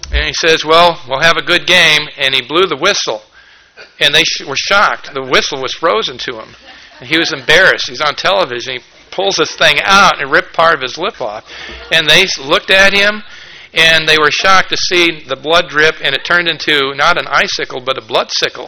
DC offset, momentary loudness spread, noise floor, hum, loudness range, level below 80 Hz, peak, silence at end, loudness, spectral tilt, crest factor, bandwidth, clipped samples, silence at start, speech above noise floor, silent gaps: under 0.1%; 12 LU; -41 dBFS; none; 3 LU; -34 dBFS; 0 dBFS; 0 s; -10 LUFS; -2 dB/octave; 12 dB; over 20 kHz; 0.9%; 0.05 s; 30 dB; none